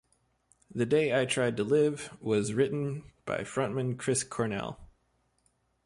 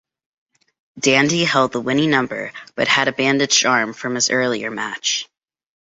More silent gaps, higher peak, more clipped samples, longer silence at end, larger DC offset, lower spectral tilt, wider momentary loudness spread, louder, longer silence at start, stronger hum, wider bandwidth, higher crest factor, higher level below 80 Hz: neither; second, -14 dBFS vs -2 dBFS; neither; first, 1 s vs 0.7 s; neither; first, -5 dB/octave vs -2.5 dB/octave; about the same, 11 LU vs 10 LU; second, -30 LUFS vs -17 LUFS; second, 0.7 s vs 0.95 s; neither; first, 11.5 kHz vs 8 kHz; about the same, 16 dB vs 18 dB; about the same, -62 dBFS vs -62 dBFS